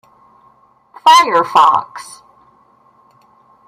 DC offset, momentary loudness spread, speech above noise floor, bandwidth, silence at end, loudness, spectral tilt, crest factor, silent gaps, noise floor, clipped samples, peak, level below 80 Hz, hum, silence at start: under 0.1%; 23 LU; 40 dB; 16 kHz; 1.65 s; -11 LUFS; -1.5 dB/octave; 16 dB; none; -51 dBFS; under 0.1%; 0 dBFS; -64 dBFS; none; 1.05 s